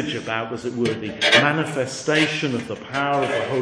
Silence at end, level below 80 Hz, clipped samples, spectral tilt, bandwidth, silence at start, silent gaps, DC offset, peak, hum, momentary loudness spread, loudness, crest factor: 0 s; -60 dBFS; under 0.1%; -4 dB/octave; 10.5 kHz; 0 s; none; under 0.1%; 0 dBFS; none; 11 LU; -21 LUFS; 22 dB